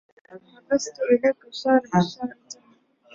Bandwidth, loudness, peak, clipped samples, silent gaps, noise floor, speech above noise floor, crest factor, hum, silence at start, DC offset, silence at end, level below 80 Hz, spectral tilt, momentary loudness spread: 7.8 kHz; -23 LUFS; -6 dBFS; under 0.1%; none; -59 dBFS; 36 dB; 18 dB; none; 0.3 s; under 0.1%; 0.6 s; -64 dBFS; -5.5 dB/octave; 21 LU